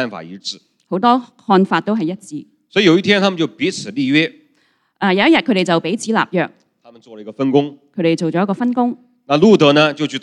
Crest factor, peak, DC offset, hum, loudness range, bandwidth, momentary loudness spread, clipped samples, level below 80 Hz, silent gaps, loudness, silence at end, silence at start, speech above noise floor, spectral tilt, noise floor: 16 dB; 0 dBFS; under 0.1%; none; 3 LU; 11.5 kHz; 16 LU; under 0.1%; -62 dBFS; none; -16 LUFS; 0.05 s; 0 s; 45 dB; -5.5 dB/octave; -60 dBFS